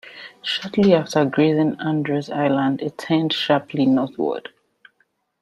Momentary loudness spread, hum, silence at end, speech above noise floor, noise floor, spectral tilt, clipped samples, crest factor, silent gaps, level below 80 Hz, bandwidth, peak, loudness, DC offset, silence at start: 9 LU; none; 1 s; 47 dB; -67 dBFS; -6.5 dB/octave; under 0.1%; 18 dB; none; -62 dBFS; 12 kHz; -2 dBFS; -20 LUFS; under 0.1%; 0.05 s